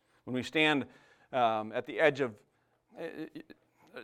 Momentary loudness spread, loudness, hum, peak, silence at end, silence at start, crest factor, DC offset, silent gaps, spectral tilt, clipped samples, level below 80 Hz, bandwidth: 18 LU; -31 LUFS; none; -10 dBFS; 0 s; 0.25 s; 24 dB; under 0.1%; none; -5 dB/octave; under 0.1%; -78 dBFS; 14 kHz